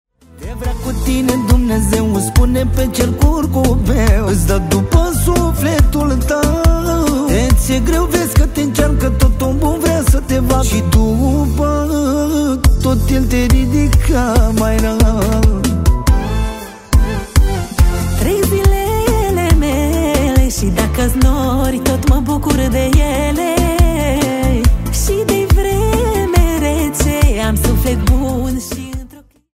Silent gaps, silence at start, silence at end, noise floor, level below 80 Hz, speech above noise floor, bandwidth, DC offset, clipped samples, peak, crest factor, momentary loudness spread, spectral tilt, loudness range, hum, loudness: none; 0.35 s; 0.4 s; -38 dBFS; -16 dBFS; 26 dB; 16.5 kHz; under 0.1%; under 0.1%; 0 dBFS; 12 dB; 3 LU; -6 dB/octave; 1 LU; none; -14 LUFS